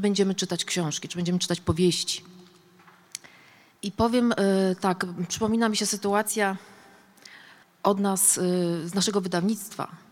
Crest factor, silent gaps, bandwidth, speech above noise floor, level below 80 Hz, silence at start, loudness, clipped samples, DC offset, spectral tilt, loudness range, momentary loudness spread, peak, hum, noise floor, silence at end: 20 dB; none; 17 kHz; 30 dB; -56 dBFS; 0 s; -25 LUFS; under 0.1%; under 0.1%; -4 dB/octave; 3 LU; 13 LU; -6 dBFS; none; -55 dBFS; 0.15 s